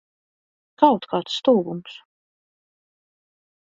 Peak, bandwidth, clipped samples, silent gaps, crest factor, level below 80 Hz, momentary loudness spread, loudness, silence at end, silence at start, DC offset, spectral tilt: 0 dBFS; 7.8 kHz; under 0.1%; none; 24 dB; -70 dBFS; 15 LU; -20 LUFS; 1.85 s; 0.8 s; under 0.1%; -6 dB/octave